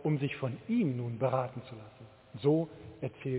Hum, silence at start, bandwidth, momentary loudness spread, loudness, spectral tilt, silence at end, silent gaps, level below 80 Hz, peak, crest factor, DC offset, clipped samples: none; 0 s; 4 kHz; 19 LU; -33 LUFS; -7.5 dB/octave; 0 s; none; -68 dBFS; -16 dBFS; 18 dB; under 0.1%; under 0.1%